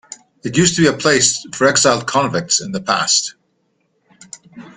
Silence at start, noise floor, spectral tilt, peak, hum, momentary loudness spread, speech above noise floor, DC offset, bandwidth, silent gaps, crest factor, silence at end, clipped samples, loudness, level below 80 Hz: 0.1 s; -65 dBFS; -3 dB/octave; 0 dBFS; none; 8 LU; 49 dB; under 0.1%; 9.8 kHz; none; 18 dB; 0.05 s; under 0.1%; -15 LUFS; -52 dBFS